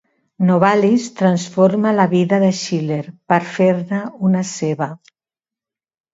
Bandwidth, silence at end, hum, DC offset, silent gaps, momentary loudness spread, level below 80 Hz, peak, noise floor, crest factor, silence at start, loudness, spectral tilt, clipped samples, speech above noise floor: 8 kHz; 1.15 s; none; under 0.1%; none; 9 LU; -64 dBFS; 0 dBFS; under -90 dBFS; 16 dB; 0.4 s; -17 LUFS; -6.5 dB/octave; under 0.1%; over 74 dB